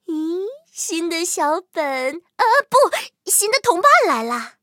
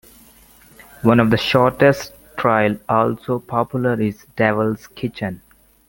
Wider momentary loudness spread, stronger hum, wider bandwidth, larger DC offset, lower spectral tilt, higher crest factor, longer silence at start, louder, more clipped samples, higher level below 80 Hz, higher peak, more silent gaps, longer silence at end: about the same, 13 LU vs 13 LU; neither; about the same, 17 kHz vs 17 kHz; neither; second, -0.5 dB/octave vs -6.5 dB/octave; about the same, 18 dB vs 18 dB; second, 0.1 s vs 1.05 s; about the same, -18 LUFS vs -18 LUFS; neither; second, -74 dBFS vs -50 dBFS; about the same, 0 dBFS vs 0 dBFS; neither; second, 0.15 s vs 0.5 s